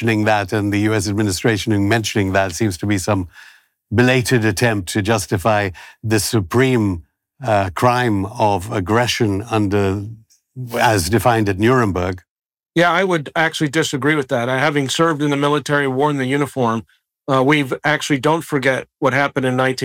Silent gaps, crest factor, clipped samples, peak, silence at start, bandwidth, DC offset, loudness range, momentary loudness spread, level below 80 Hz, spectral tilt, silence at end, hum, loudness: 12.29-12.36 s; 14 dB; under 0.1%; -4 dBFS; 0 s; 17.5 kHz; under 0.1%; 1 LU; 6 LU; -50 dBFS; -5 dB/octave; 0 s; none; -17 LUFS